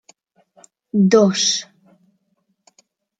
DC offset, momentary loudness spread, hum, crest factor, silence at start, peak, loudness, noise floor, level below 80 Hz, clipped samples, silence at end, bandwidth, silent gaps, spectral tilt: under 0.1%; 10 LU; none; 20 dB; 0.95 s; -2 dBFS; -16 LUFS; -69 dBFS; -66 dBFS; under 0.1%; 1.55 s; 9.2 kHz; none; -4.5 dB/octave